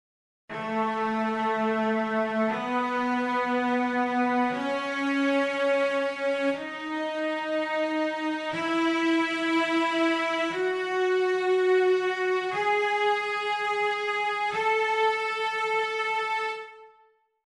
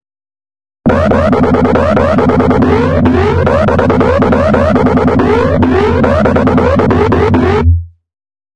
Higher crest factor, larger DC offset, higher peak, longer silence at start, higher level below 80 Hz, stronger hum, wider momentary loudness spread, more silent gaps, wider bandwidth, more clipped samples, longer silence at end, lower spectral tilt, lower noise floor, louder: about the same, 12 dB vs 10 dB; second, under 0.1% vs 2%; second, -14 dBFS vs 0 dBFS; second, 0.5 s vs 0.85 s; second, -72 dBFS vs -28 dBFS; neither; first, 5 LU vs 1 LU; neither; first, 11.5 kHz vs 8.8 kHz; neither; first, 0.6 s vs 0.4 s; second, -4 dB/octave vs -8.5 dB/octave; second, -63 dBFS vs under -90 dBFS; second, -26 LUFS vs -9 LUFS